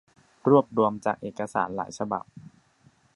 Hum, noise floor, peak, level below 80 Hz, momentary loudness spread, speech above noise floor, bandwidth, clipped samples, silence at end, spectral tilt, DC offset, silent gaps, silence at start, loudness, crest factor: none; -61 dBFS; -6 dBFS; -66 dBFS; 11 LU; 36 dB; 11.5 kHz; under 0.1%; 0.75 s; -7 dB/octave; under 0.1%; none; 0.45 s; -26 LUFS; 22 dB